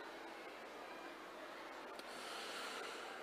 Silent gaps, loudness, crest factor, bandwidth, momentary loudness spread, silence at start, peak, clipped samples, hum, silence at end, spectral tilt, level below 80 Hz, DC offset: none; -50 LUFS; 20 dB; 15 kHz; 6 LU; 0 s; -32 dBFS; under 0.1%; none; 0 s; -1.5 dB/octave; -84 dBFS; under 0.1%